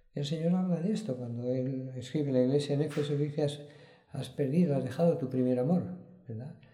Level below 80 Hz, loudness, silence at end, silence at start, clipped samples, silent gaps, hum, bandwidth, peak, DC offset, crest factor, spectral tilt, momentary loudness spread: -72 dBFS; -31 LUFS; 0.15 s; 0.15 s; under 0.1%; none; none; 11.5 kHz; -14 dBFS; under 0.1%; 16 dB; -8 dB/octave; 15 LU